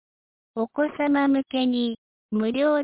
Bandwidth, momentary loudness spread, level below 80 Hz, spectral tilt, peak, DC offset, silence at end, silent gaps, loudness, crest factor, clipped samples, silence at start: 4 kHz; 9 LU; -66 dBFS; -9.5 dB/octave; -12 dBFS; under 0.1%; 0 s; 1.98-2.29 s; -24 LUFS; 12 dB; under 0.1%; 0.55 s